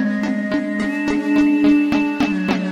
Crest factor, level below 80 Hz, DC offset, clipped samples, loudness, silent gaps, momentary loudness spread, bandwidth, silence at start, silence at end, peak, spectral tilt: 12 dB; -48 dBFS; under 0.1%; under 0.1%; -18 LUFS; none; 6 LU; 9.2 kHz; 0 s; 0 s; -4 dBFS; -6.5 dB/octave